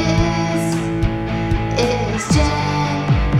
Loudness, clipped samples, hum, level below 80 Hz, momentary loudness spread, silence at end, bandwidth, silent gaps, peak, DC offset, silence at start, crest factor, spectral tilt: -18 LUFS; under 0.1%; none; -26 dBFS; 4 LU; 0 s; 14 kHz; none; -4 dBFS; under 0.1%; 0 s; 14 dB; -6 dB/octave